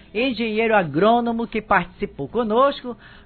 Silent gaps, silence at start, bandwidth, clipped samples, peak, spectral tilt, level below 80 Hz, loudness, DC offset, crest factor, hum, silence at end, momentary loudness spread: none; 0.15 s; 4.6 kHz; under 0.1%; -4 dBFS; -9.5 dB/octave; -48 dBFS; -20 LUFS; under 0.1%; 18 dB; none; 0.05 s; 12 LU